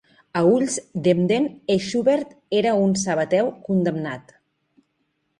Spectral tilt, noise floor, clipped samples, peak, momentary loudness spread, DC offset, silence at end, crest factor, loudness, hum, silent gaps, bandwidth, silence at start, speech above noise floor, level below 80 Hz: -5.5 dB/octave; -72 dBFS; under 0.1%; -6 dBFS; 6 LU; under 0.1%; 1.2 s; 16 dB; -21 LUFS; none; none; 11.5 kHz; 0.35 s; 51 dB; -62 dBFS